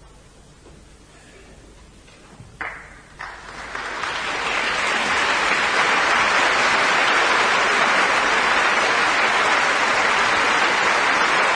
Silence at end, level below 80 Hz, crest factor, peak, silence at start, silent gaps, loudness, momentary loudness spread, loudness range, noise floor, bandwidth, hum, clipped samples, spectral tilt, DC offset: 0 s; -50 dBFS; 16 dB; -4 dBFS; 0.65 s; none; -17 LUFS; 15 LU; 16 LU; -47 dBFS; 10.5 kHz; none; under 0.1%; -1 dB/octave; under 0.1%